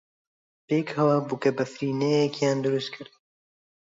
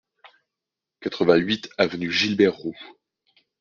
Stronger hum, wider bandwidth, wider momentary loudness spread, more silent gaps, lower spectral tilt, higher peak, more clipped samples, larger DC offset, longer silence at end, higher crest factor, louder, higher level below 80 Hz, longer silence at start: neither; about the same, 7.8 kHz vs 7.2 kHz; second, 6 LU vs 15 LU; neither; first, -6.5 dB/octave vs -5 dB/octave; second, -10 dBFS vs -4 dBFS; neither; neither; first, 0.9 s vs 0.75 s; about the same, 18 dB vs 20 dB; second, -25 LUFS vs -22 LUFS; second, -72 dBFS vs -62 dBFS; second, 0.7 s vs 1 s